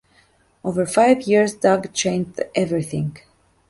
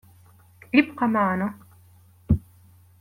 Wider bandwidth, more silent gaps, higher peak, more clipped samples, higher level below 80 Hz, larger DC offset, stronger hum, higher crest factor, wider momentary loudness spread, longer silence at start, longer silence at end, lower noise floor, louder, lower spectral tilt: second, 11.5 kHz vs 16 kHz; neither; about the same, -4 dBFS vs -4 dBFS; neither; second, -56 dBFS vs -44 dBFS; neither; neither; second, 18 dB vs 24 dB; first, 10 LU vs 6 LU; about the same, 0.65 s vs 0.75 s; about the same, 0.5 s vs 0.6 s; first, -58 dBFS vs -54 dBFS; first, -20 LUFS vs -24 LUFS; second, -5 dB/octave vs -8 dB/octave